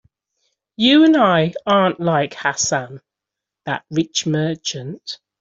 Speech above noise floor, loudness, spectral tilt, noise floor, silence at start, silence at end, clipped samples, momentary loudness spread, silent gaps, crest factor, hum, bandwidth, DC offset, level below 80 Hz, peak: 67 dB; -17 LUFS; -4 dB/octave; -85 dBFS; 0.8 s; 0.25 s; under 0.1%; 17 LU; none; 16 dB; none; 7.8 kHz; under 0.1%; -60 dBFS; -2 dBFS